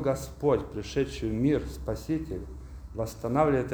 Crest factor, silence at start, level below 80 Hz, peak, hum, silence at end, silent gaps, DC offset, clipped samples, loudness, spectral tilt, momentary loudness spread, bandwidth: 18 dB; 0 s; -42 dBFS; -10 dBFS; none; 0 s; none; under 0.1%; under 0.1%; -30 LUFS; -7 dB/octave; 13 LU; over 20 kHz